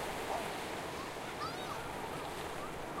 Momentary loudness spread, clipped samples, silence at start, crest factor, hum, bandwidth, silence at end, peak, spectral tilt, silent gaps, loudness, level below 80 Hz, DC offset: 4 LU; under 0.1%; 0 s; 16 dB; none; 16 kHz; 0 s; -26 dBFS; -3.5 dB/octave; none; -41 LUFS; -58 dBFS; under 0.1%